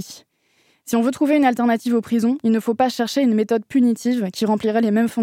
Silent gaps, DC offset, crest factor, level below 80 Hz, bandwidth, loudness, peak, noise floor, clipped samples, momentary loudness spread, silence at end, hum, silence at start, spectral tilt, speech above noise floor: none; under 0.1%; 14 dB; -66 dBFS; 16 kHz; -19 LUFS; -4 dBFS; -62 dBFS; under 0.1%; 4 LU; 0 s; none; 0 s; -5.5 dB/octave; 43 dB